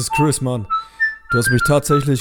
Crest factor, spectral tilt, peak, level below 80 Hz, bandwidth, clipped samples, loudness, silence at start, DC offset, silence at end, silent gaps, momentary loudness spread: 14 dB; -5 dB/octave; -2 dBFS; -38 dBFS; 19 kHz; under 0.1%; -17 LUFS; 0 s; under 0.1%; 0 s; none; 6 LU